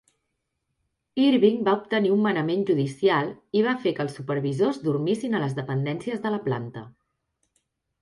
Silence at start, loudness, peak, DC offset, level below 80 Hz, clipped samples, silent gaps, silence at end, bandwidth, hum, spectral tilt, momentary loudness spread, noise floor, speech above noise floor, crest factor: 1.15 s; -24 LUFS; -8 dBFS; under 0.1%; -68 dBFS; under 0.1%; none; 1.1 s; 11.5 kHz; none; -7 dB/octave; 8 LU; -79 dBFS; 55 dB; 18 dB